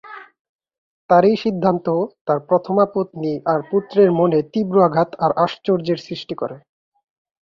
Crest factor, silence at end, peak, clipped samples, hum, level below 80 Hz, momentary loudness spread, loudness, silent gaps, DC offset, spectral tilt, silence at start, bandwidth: 16 dB; 1 s; -2 dBFS; under 0.1%; none; -62 dBFS; 11 LU; -18 LUFS; 0.39-0.59 s, 0.78-1.09 s, 2.21-2.25 s; under 0.1%; -8.5 dB/octave; 0.05 s; 7 kHz